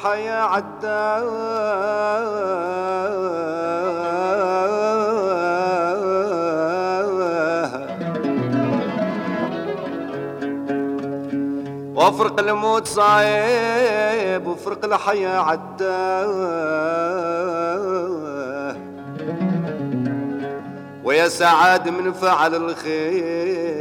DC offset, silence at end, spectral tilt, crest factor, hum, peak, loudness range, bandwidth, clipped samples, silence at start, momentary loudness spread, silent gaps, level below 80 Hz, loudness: under 0.1%; 0 s; -5 dB/octave; 18 dB; none; -2 dBFS; 6 LU; 16 kHz; under 0.1%; 0 s; 10 LU; none; -66 dBFS; -21 LUFS